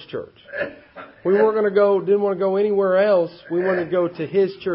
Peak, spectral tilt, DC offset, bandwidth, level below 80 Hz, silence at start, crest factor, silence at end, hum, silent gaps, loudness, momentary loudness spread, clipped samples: -6 dBFS; -11.5 dB/octave; under 0.1%; 5.6 kHz; -64 dBFS; 0 s; 14 dB; 0 s; none; none; -20 LUFS; 12 LU; under 0.1%